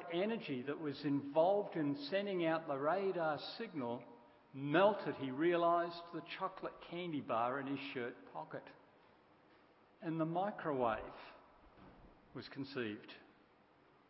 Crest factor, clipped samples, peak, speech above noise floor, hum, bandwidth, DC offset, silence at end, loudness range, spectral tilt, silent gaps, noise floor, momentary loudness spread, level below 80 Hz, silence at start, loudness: 22 dB; under 0.1%; -18 dBFS; 30 dB; none; 5.6 kHz; under 0.1%; 0.85 s; 7 LU; -4.5 dB/octave; none; -69 dBFS; 17 LU; -76 dBFS; 0 s; -39 LUFS